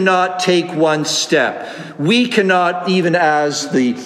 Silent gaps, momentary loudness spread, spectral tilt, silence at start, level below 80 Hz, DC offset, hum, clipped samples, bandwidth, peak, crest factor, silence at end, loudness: none; 5 LU; -4 dB/octave; 0 s; -68 dBFS; under 0.1%; none; under 0.1%; 14.5 kHz; -2 dBFS; 14 dB; 0 s; -15 LUFS